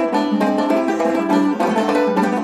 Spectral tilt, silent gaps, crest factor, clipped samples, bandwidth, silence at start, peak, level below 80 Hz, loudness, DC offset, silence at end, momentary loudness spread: -6 dB/octave; none; 14 dB; under 0.1%; 14.5 kHz; 0 s; -4 dBFS; -64 dBFS; -17 LUFS; under 0.1%; 0 s; 1 LU